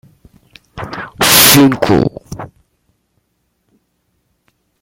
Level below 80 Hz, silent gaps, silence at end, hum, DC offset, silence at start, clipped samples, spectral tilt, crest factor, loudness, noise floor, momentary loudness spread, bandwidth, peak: -42 dBFS; none; 2.35 s; none; under 0.1%; 0.75 s; 0.2%; -3 dB/octave; 16 dB; -8 LUFS; -65 dBFS; 25 LU; over 20 kHz; 0 dBFS